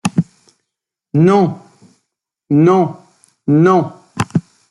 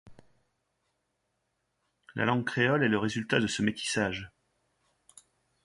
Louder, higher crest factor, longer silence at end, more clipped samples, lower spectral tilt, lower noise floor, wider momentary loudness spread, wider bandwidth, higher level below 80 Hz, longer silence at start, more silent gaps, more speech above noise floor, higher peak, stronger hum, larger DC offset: first, -14 LUFS vs -29 LUFS; second, 16 dB vs 22 dB; second, 0.3 s vs 1.35 s; neither; first, -8 dB/octave vs -4.5 dB/octave; about the same, -79 dBFS vs -79 dBFS; first, 15 LU vs 11 LU; about the same, 11.5 kHz vs 11.5 kHz; first, -56 dBFS vs -62 dBFS; about the same, 0.05 s vs 0.05 s; neither; first, 68 dB vs 51 dB; first, 0 dBFS vs -10 dBFS; neither; neither